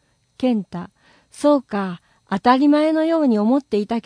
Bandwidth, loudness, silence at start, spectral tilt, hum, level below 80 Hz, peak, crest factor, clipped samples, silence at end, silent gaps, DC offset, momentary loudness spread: 10.5 kHz; -19 LUFS; 0.4 s; -6.5 dB/octave; none; -60 dBFS; -2 dBFS; 16 dB; under 0.1%; 0.05 s; none; under 0.1%; 16 LU